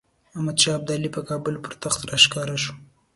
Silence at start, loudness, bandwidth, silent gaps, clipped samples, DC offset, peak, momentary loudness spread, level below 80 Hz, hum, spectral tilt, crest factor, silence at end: 0.35 s; -22 LUFS; 12 kHz; none; under 0.1%; under 0.1%; 0 dBFS; 14 LU; -56 dBFS; none; -2.5 dB/octave; 24 dB; 0.3 s